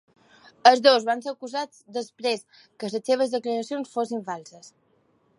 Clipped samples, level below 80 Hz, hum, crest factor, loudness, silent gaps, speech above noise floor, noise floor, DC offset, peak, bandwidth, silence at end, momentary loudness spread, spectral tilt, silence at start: under 0.1%; -82 dBFS; none; 24 dB; -24 LUFS; none; 41 dB; -65 dBFS; under 0.1%; -2 dBFS; 11.5 kHz; 0.7 s; 16 LU; -3 dB/octave; 0.65 s